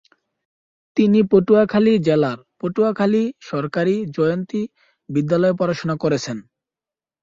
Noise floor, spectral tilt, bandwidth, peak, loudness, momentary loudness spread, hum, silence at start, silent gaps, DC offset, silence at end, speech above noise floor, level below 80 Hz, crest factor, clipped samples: under -90 dBFS; -7 dB/octave; 7.6 kHz; -2 dBFS; -19 LUFS; 12 LU; none; 0.95 s; none; under 0.1%; 0.8 s; over 72 dB; -58 dBFS; 18 dB; under 0.1%